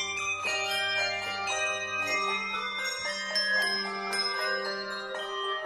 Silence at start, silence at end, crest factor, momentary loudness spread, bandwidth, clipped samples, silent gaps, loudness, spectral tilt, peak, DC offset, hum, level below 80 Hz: 0 s; 0 s; 16 dB; 6 LU; 16 kHz; under 0.1%; none; -29 LUFS; -0.5 dB/octave; -16 dBFS; under 0.1%; none; -68 dBFS